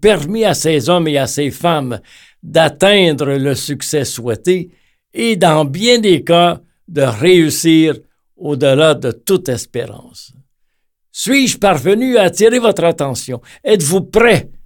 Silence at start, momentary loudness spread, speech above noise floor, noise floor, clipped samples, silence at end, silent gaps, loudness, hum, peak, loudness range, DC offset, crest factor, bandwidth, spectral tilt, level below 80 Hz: 0 s; 13 LU; 50 dB; -63 dBFS; under 0.1%; 0.05 s; none; -13 LUFS; none; 0 dBFS; 4 LU; under 0.1%; 14 dB; 19 kHz; -4.5 dB/octave; -44 dBFS